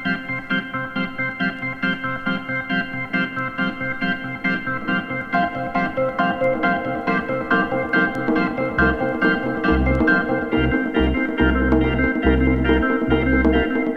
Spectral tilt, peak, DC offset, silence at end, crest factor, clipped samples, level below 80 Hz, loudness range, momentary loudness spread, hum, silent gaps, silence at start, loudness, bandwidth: -8 dB/octave; -4 dBFS; under 0.1%; 0 s; 16 dB; under 0.1%; -30 dBFS; 5 LU; 6 LU; none; none; 0 s; -20 LUFS; 6.2 kHz